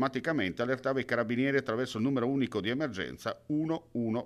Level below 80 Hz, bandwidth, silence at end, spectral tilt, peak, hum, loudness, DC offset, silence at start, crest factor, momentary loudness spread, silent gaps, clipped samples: -64 dBFS; 13 kHz; 0 s; -6.5 dB/octave; -14 dBFS; none; -32 LUFS; under 0.1%; 0 s; 18 dB; 5 LU; none; under 0.1%